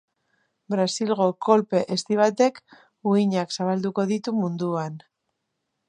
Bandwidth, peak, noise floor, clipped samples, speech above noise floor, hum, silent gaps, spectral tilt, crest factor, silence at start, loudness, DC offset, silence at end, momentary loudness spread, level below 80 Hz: 10.5 kHz; -4 dBFS; -78 dBFS; under 0.1%; 56 dB; none; none; -5.5 dB/octave; 20 dB; 0.7 s; -23 LUFS; under 0.1%; 0.9 s; 9 LU; -74 dBFS